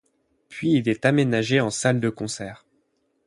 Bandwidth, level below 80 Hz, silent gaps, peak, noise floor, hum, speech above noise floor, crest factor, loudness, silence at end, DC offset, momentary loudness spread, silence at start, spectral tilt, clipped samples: 11.5 kHz; -60 dBFS; none; -6 dBFS; -69 dBFS; none; 47 dB; 18 dB; -22 LUFS; 0.7 s; under 0.1%; 12 LU; 0.5 s; -5.5 dB/octave; under 0.1%